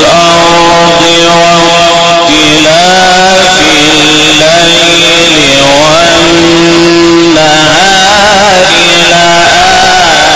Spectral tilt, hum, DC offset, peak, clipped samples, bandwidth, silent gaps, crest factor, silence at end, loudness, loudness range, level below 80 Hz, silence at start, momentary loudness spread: -2.5 dB/octave; none; 3%; 0 dBFS; 2%; 14.5 kHz; none; 4 dB; 0 s; -2 LUFS; 1 LU; -30 dBFS; 0 s; 1 LU